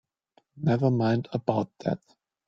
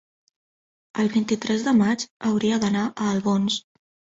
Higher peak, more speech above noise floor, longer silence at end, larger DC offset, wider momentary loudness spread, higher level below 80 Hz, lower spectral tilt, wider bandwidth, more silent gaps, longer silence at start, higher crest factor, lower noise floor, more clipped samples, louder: first, -6 dBFS vs -10 dBFS; second, 41 dB vs over 68 dB; about the same, 0.5 s vs 0.45 s; neither; about the same, 8 LU vs 6 LU; about the same, -64 dBFS vs -62 dBFS; first, -9 dB/octave vs -5 dB/octave; second, 7.2 kHz vs 8 kHz; second, none vs 2.10-2.20 s; second, 0.55 s vs 0.95 s; first, 22 dB vs 14 dB; second, -67 dBFS vs under -90 dBFS; neither; second, -27 LUFS vs -23 LUFS